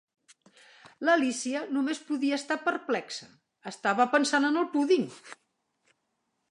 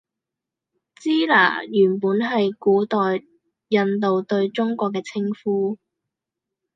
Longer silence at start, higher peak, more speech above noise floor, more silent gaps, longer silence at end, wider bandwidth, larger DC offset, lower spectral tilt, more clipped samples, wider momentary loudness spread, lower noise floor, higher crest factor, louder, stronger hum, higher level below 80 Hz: second, 0.85 s vs 1 s; second, -10 dBFS vs -2 dBFS; second, 51 dB vs 66 dB; neither; first, 1.15 s vs 1 s; first, 11 kHz vs 7.6 kHz; neither; second, -3.5 dB/octave vs -6.5 dB/octave; neither; first, 15 LU vs 9 LU; second, -79 dBFS vs -86 dBFS; about the same, 20 dB vs 20 dB; second, -28 LUFS vs -21 LUFS; neither; second, -84 dBFS vs -74 dBFS